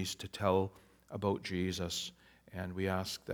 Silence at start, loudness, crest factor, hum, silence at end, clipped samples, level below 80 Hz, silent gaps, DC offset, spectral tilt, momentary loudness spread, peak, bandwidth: 0 s; -37 LUFS; 20 dB; none; 0 s; under 0.1%; -64 dBFS; none; under 0.1%; -5 dB/octave; 12 LU; -16 dBFS; over 20 kHz